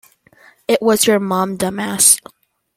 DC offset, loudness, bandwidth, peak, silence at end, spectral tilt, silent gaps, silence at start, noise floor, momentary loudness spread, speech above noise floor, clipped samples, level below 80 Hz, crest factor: under 0.1%; -14 LUFS; 16.5 kHz; 0 dBFS; 0.6 s; -2.5 dB/octave; none; 0.7 s; -50 dBFS; 10 LU; 34 dB; under 0.1%; -56 dBFS; 18 dB